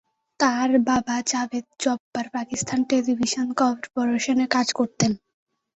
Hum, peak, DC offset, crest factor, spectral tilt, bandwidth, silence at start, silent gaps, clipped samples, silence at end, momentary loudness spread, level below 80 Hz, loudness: none; -4 dBFS; under 0.1%; 20 dB; -3.5 dB/octave; 8.2 kHz; 0.4 s; 2.00-2.12 s; under 0.1%; 0.6 s; 8 LU; -60 dBFS; -23 LUFS